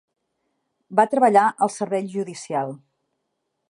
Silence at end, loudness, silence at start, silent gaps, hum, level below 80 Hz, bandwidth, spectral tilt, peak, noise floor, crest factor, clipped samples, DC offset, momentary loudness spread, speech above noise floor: 0.95 s; -21 LUFS; 0.9 s; none; none; -80 dBFS; 11.5 kHz; -5.5 dB/octave; -4 dBFS; -77 dBFS; 20 dB; under 0.1%; under 0.1%; 13 LU; 56 dB